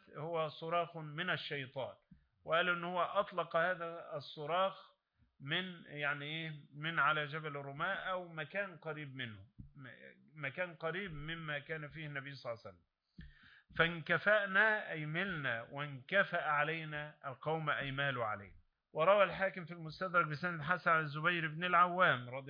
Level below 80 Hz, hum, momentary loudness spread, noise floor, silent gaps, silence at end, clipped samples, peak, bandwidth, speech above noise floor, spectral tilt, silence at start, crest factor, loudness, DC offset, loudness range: -68 dBFS; none; 15 LU; -61 dBFS; none; 0 s; under 0.1%; -16 dBFS; 5.2 kHz; 24 dB; -2.5 dB/octave; 0.1 s; 22 dB; -37 LUFS; under 0.1%; 9 LU